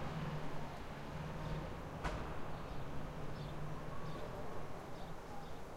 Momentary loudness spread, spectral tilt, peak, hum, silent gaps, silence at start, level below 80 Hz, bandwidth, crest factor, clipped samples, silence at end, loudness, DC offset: 6 LU; -6.5 dB/octave; -28 dBFS; none; none; 0 s; -52 dBFS; 16 kHz; 14 dB; under 0.1%; 0 s; -47 LUFS; under 0.1%